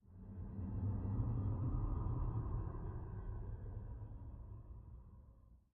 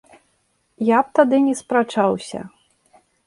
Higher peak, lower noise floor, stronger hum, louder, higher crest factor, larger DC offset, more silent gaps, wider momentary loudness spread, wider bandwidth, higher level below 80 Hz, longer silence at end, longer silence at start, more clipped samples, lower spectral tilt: second, -26 dBFS vs -2 dBFS; about the same, -63 dBFS vs -66 dBFS; neither; second, -45 LUFS vs -18 LUFS; about the same, 18 dB vs 18 dB; neither; neither; about the same, 16 LU vs 17 LU; second, 2.7 kHz vs 11.5 kHz; first, -48 dBFS vs -64 dBFS; second, 0.15 s vs 0.8 s; second, 0.05 s vs 0.8 s; neither; first, -12.5 dB/octave vs -5.5 dB/octave